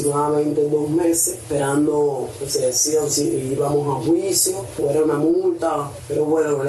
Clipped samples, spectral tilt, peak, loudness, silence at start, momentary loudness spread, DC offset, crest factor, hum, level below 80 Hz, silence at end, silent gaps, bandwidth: under 0.1%; -4.5 dB/octave; -6 dBFS; -19 LUFS; 0 s; 5 LU; under 0.1%; 14 dB; none; -52 dBFS; 0 s; none; 12.5 kHz